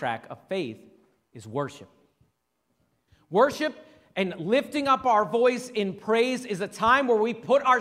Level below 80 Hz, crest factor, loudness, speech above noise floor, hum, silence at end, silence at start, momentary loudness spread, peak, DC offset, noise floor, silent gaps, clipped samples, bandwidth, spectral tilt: -64 dBFS; 20 dB; -25 LUFS; 51 dB; none; 0 s; 0 s; 12 LU; -6 dBFS; under 0.1%; -75 dBFS; none; under 0.1%; 14.5 kHz; -5 dB/octave